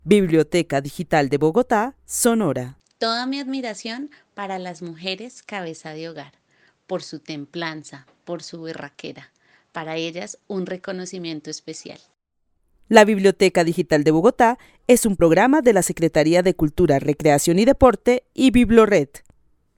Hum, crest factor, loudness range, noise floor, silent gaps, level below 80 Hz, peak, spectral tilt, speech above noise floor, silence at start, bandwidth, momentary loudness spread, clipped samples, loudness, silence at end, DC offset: none; 20 dB; 16 LU; -69 dBFS; none; -44 dBFS; 0 dBFS; -5 dB/octave; 50 dB; 0.05 s; 18 kHz; 19 LU; under 0.1%; -19 LUFS; 0.6 s; under 0.1%